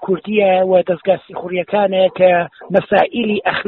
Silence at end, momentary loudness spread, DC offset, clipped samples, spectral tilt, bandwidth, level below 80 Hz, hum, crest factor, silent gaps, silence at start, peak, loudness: 0.05 s; 6 LU; under 0.1%; under 0.1%; -4 dB/octave; 4.5 kHz; -56 dBFS; none; 14 dB; none; 0 s; 0 dBFS; -15 LUFS